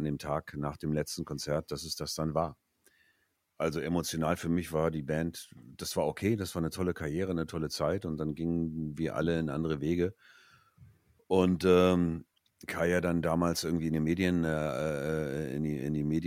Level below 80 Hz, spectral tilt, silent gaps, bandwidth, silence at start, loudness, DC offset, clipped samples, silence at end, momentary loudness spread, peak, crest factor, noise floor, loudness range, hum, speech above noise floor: -54 dBFS; -6 dB/octave; none; 16 kHz; 0 s; -32 LUFS; under 0.1%; under 0.1%; 0 s; 7 LU; -12 dBFS; 20 dB; -74 dBFS; 6 LU; none; 43 dB